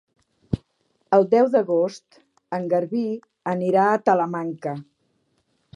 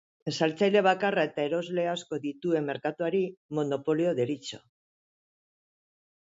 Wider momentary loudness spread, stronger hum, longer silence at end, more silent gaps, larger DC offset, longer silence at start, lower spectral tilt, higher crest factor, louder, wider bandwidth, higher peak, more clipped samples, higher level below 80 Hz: about the same, 13 LU vs 11 LU; neither; second, 0.95 s vs 1.65 s; second, none vs 3.37-3.49 s; neither; first, 0.5 s vs 0.25 s; first, -7.5 dB/octave vs -5.5 dB/octave; about the same, 20 dB vs 18 dB; first, -22 LUFS vs -28 LUFS; first, 10.5 kHz vs 7.8 kHz; first, -4 dBFS vs -12 dBFS; neither; first, -54 dBFS vs -76 dBFS